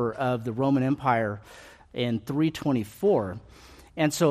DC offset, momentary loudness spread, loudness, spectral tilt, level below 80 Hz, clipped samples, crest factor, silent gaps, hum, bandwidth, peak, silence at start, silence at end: under 0.1%; 15 LU; -26 LUFS; -6 dB/octave; -58 dBFS; under 0.1%; 18 dB; none; none; 15 kHz; -10 dBFS; 0 s; 0 s